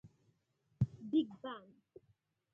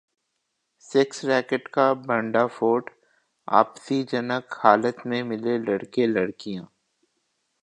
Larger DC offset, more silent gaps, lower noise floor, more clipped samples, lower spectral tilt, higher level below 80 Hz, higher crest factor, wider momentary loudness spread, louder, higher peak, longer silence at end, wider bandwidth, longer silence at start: neither; neither; about the same, -79 dBFS vs -77 dBFS; neither; first, -9.5 dB/octave vs -5.5 dB/octave; about the same, -66 dBFS vs -70 dBFS; about the same, 22 dB vs 24 dB; first, 13 LU vs 8 LU; second, -39 LUFS vs -24 LUFS; second, -20 dBFS vs 0 dBFS; about the same, 0.95 s vs 1 s; second, 3.8 kHz vs 10 kHz; second, 0.05 s vs 0.9 s